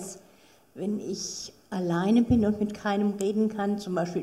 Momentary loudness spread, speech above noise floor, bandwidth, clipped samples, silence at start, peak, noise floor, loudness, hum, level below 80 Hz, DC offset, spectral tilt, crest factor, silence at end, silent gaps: 13 LU; 32 dB; 13.5 kHz; under 0.1%; 0 s; -12 dBFS; -58 dBFS; -27 LUFS; none; -52 dBFS; under 0.1%; -6 dB/octave; 16 dB; 0 s; none